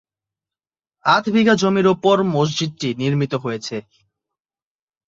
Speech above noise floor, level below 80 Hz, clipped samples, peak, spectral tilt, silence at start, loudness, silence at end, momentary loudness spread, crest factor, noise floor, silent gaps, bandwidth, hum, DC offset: over 72 dB; -60 dBFS; under 0.1%; -2 dBFS; -5.5 dB/octave; 1.05 s; -18 LUFS; 1.25 s; 10 LU; 18 dB; under -90 dBFS; none; 7.8 kHz; none; under 0.1%